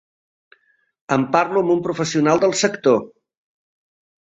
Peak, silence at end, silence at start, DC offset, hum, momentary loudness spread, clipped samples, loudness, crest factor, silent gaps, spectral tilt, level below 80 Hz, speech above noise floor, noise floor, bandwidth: -2 dBFS; 1.15 s; 1.1 s; under 0.1%; none; 5 LU; under 0.1%; -18 LUFS; 18 dB; none; -4.5 dB/octave; -62 dBFS; 39 dB; -57 dBFS; 8.4 kHz